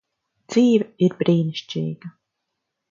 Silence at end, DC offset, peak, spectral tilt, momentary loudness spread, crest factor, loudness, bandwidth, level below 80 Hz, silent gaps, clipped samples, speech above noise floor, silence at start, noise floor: 0.8 s; under 0.1%; -4 dBFS; -7 dB/octave; 11 LU; 18 dB; -21 LUFS; 7.6 kHz; -66 dBFS; none; under 0.1%; 60 dB; 0.5 s; -79 dBFS